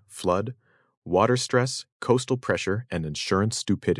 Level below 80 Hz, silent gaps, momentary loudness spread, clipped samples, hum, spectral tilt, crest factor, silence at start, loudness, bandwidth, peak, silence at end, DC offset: -60 dBFS; 0.97-1.02 s, 1.92-2.00 s; 7 LU; under 0.1%; none; -5 dB/octave; 20 dB; 0.1 s; -25 LUFS; 12 kHz; -6 dBFS; 0 s; under 0.1%